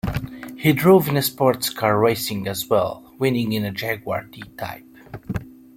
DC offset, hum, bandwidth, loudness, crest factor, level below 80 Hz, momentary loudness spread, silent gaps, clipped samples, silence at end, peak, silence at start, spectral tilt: under 0.1%; none; 16.5 kHz; -21 LUFS; 20 dB; -46 dBFS; 17 LU; none; under 0.1%; 0.25 s; -2 dBFS; 0.05 s; -5.5 dB/octave